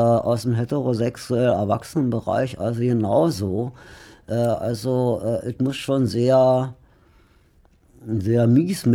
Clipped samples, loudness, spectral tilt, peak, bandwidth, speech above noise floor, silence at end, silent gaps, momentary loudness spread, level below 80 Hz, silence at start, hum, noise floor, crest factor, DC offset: under 0.1%; -21 LUFS; -7.5 dB/octave; -6 dBFS; 15.5 kHz; 36 dB; 0 s; none; 9 LU; -54 dBFS; 0 s; none; -56 dBFS; 14 dB; under 0.1%